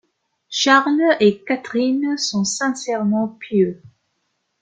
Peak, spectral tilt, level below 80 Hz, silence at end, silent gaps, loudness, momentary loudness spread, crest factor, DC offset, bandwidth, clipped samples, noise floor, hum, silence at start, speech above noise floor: -2 dBFS; -4 dB/octave; -66 dBFS; 0.75 s; none; -18 LUFS; 8 LU; 18 dB; under 0.1%; 9.4 kHz; under 0.1%; -71 dBFS; none; 0.5 s; 53 dB